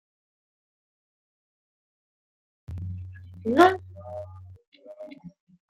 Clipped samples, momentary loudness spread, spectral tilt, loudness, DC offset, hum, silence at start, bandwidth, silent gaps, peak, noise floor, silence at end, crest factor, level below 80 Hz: under 0.1%; 25 LU; -6.5 dB/octave; -23 LUFS; under 0.1%; none; 2.7 s; 15.5 kHz; 4.67-4.72 s; -4 dBFS; -45 dBFS; 0.4 s; 28 dB; -62 dBFS